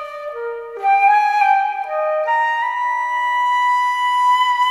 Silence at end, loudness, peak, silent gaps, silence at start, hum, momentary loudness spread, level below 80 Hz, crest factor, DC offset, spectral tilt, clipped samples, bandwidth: 0 s; -16 LUFS; -4 dBFS; none; 0 s; none; 12 LU; -68 dBFS; 12 dB; under 0.1%; 1.5 dB/octave; under 0.1%; 13 kHz